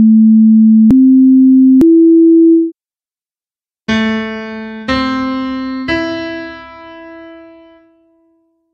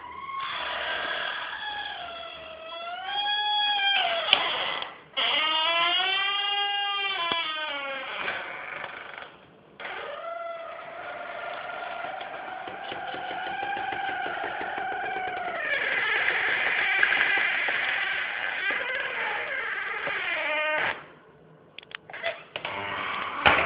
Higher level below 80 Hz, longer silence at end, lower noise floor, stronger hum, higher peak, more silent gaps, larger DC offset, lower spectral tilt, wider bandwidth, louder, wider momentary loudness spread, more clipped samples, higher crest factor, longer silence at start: first, -44 dBFS vs -64 dBFS; first, 1.4 s vs 0 s; first, under -90 dBFS vs -54 dBFS; neither; about the same, -2 dBFS vs 0 dBFS; neither; neither; first, -7.5 dB/octave vs -5 dB/octave; first, 6.6 kHz vs 5.4 kHz; first, -9 LUFS vs -27 LUFS; about the same, 17 LU vs 15 LU; neither; second, 10 dB vs 28 dB; about the same, 0 s vs 0 s